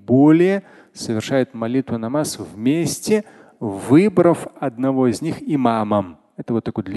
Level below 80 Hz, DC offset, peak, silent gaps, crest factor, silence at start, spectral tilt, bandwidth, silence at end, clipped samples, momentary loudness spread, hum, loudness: -54 dBFS; under 0.1%; -2 dBFS; none; 18 dB; 0.1 s; -6.5 dB/octave; 12.5 kHz; 0 s; under 0.1%; 13 LU; none; -19 LUFS